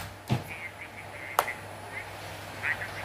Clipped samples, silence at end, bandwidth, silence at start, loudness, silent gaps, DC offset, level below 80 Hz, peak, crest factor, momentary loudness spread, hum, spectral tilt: under 0.1%; 0 s; 15.5 kHz; 0 s; -34 LUFS; none; under 0.1%; -60 dBFS; -2 dBFS; 32 dB; 10 LU; none; -4 dB/octave